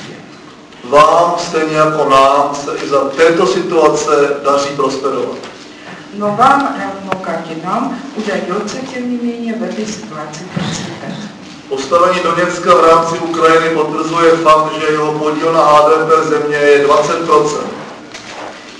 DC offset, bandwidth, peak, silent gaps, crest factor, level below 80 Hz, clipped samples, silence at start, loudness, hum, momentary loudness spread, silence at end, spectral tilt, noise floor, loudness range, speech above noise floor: under 0.1%; 11 kHz; 0 dBFS; none; 12 dB; -50 dBFS; 0.1%; 0 s; -12 LUFS; none; 18 LU; 0 s; -4.5 dB/octave; -35 dBFS; 9 LU; 23 dB